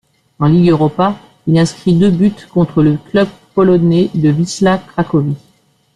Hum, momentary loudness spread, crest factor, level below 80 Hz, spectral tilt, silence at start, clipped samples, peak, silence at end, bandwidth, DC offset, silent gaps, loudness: none; 6 LU; 10 dB; -44 dBFS; -7.5 dB/octave; 0.4 s; under 0.1%; -2 dBFS; 0.6 s; 10.5 kHz; under 0.1%; none; -13 LUFS